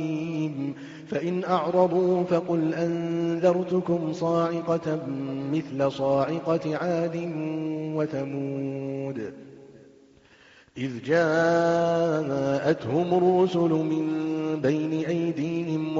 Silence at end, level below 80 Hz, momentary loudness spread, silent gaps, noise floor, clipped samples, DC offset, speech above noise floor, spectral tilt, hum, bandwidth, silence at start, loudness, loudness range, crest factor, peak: 0 s; -66 dBFS; 10 LU; none; -55 dBFS; under 0.1%; under 0.1%; 30 dB; -6.5 dB/octave; none; 7.6 kHz; 0 s; -26 LUFS; 7 LU; 18 dB; -8 dBFS